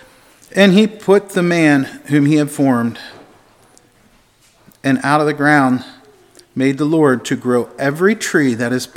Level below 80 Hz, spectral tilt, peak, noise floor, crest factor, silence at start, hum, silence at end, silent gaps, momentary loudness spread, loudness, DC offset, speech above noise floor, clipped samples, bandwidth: -62 dBFS; -6 dB/octave; 0 dBFS; -52 dBFS; 16 dB; 0.55 s; none; 0.1 s; none; 9 LU; -15 LUFS; under 0.1%; 38 dB; under 0.1%; 16 kHz